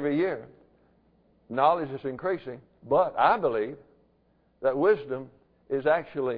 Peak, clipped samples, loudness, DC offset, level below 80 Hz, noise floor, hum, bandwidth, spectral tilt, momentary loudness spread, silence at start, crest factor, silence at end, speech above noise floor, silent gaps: -8 dBFS; under 0.1%; -27 LUFS; under 0.1%; -64 dBFS; -66 dBFS; none; 5 kHz; -9.5 dB/octave; 15 LU; 0 s; 20 dB; 0 s; 40 dB; none